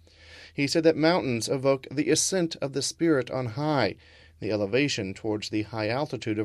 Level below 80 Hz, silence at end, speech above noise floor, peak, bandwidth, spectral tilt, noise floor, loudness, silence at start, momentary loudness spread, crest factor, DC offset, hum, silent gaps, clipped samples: -60 dBFS; 0 s; 24 dB; -8 dBFS; 14 kHz; -4.5 dB/octave; -50 dBFS; -26 LUFS; 0.25 s; 8 LU; 20 dB; under 0.1%; none; none; under 0.1%